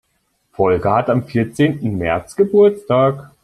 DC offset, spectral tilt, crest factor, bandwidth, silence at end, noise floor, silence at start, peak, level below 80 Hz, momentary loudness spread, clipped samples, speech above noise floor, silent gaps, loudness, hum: under 0.1%; -7.5 dB/octave; 14 dB; 12 kHz; 0.15 s; -66 dBFS; 0.6 s; -2 dBFS; -48 dBFS; 8 LU; under 0.1%; 50 dB; none; -16 LUFS; none